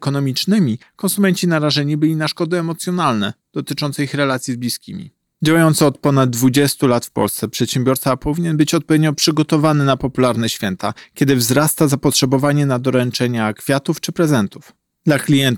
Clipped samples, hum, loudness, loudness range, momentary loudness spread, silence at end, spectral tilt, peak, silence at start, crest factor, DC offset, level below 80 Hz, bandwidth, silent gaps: under 0.1%; none; -17 LUFS; 3 LU; 8 LU; 0 s; -5 dB/octave; -4 dBFS; 0 s; 14 dB; under 0.1%; -48 dBFS; 19 kHz; none